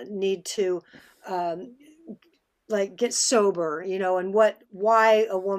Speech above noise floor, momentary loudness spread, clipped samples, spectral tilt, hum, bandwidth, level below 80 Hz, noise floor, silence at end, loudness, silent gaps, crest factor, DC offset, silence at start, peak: 42 dB; 11 LU; under 0.1%; -3 dB/octave; none; 15 kHz; -76 dBFS; -66 dBFS; 0 s; -24 LUFS; none; 18 dB; under 0.1%; 0 s; -6 dBFS